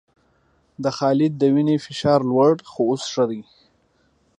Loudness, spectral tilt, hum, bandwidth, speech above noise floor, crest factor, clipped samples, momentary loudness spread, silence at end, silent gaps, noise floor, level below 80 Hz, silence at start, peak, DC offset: -20 LUFS; -6.5 dB/octave; none; 10 kHz; 43 dB; 18 dB; under 0.1%; 7 LU; 0.95 s; none; -63 dBFS; -62 dBFS; 0.8 s; -4 dBFS; under 0.1%